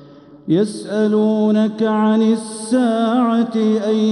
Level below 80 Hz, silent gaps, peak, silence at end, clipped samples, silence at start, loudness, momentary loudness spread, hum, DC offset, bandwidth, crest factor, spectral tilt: -70 dBFS; none; -6 dBFS; 0 s; under 0.1%; 0 s; -17 LUFS; 5 LU; none; under 0.1%; 11 kHz; 12 dB; -6.5 dB/octave